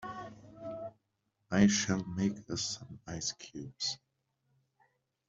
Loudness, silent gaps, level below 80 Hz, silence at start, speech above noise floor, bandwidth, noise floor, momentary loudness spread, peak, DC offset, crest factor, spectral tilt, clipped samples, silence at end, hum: -33 LUFS; none; -66 dBFS; 0 s; 48 dB; 7.8 kHz; -81 dBFS; 19 LU; -12 dBFS; under 0.1%; 24 dB; -4 dB/octave; under 0.1%; 1.3 s; none